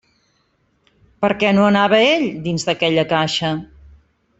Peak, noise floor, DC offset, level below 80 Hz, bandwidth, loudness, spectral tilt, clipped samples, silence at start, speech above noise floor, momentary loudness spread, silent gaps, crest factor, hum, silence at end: -2 dBFS; -63 dBFS; under 0.1%; -52 dBFS; 8 kHz; -17 LUFS; -5 dB/octave; under 0.1%; 1.2 s; 47 dB; 9 LU; none; 16 dB; none; 0.75 s